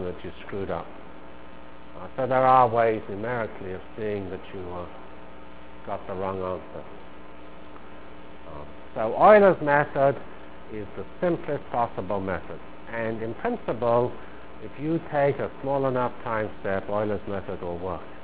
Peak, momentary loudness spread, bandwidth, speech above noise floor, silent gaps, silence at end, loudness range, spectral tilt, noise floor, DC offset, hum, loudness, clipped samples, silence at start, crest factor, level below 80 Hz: -2 dBFS; 26 LU; 4 kHz; 21 dB; none; 0 s; 14 LU; -10.5 dB/octave; -46 dBFS; 1%; none; -26 LUFS; under 0.1%; 0 s; 24 dB; -52 dBFS